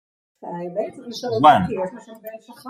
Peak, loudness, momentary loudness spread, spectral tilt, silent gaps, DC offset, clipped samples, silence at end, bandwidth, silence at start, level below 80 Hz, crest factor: -2 dBFS; -20 LUFS; 24 LU; -6 dB/octave; none; under 0.1%; under 0.1%; 0 s; 15.5 kHz; 0.45 s; -60 dBFS; 20 dB